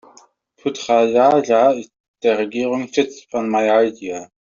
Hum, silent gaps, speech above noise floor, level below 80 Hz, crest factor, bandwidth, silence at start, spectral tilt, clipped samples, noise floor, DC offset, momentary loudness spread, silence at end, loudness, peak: none; 2.00-2.14 s; 35 dB; -64 dBFS; 16 dB; 7.6 kHz; 0.65 s; -3.5 dB/octave; under 0.1%; -52 dBFS; under 0.1%; 13 LU; 0.3 s; -18 LUFS; -2 dBFS